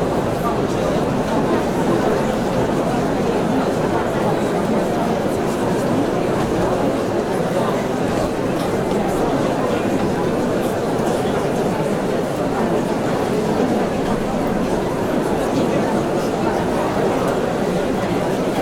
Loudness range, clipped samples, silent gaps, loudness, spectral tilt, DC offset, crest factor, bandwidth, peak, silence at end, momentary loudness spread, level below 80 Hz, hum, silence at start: 1 LU; under 0.1%; none; -19 LUFS; -6 dB/octave; 0.2%; 14 dB; 17.5 kHz; -4 dBFS; 0 s; 2 LU; -38 dBFS; none; 0 s